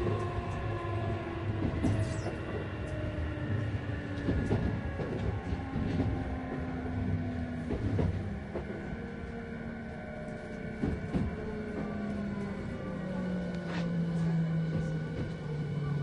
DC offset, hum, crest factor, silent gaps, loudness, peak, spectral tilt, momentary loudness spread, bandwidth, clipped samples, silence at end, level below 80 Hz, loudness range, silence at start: under 0.1%; none; 18 dB; none; -35 LUFS; -16 dBFS; -8 dB/octave; 9 LU; 11 kHz; under 0.1%; 0 s; -44 dBFS; 3 LU; 0 s